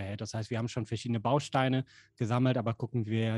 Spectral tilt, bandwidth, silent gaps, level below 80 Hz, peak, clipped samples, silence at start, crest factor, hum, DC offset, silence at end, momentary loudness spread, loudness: -6.5 dB/octave; 10.5 kHz; none; -66 dBFS; -12 dBFS; under 0.1%; 0 s; 18 dB; none; under 0.1%; 0 s; 9 LU; -32 LUFS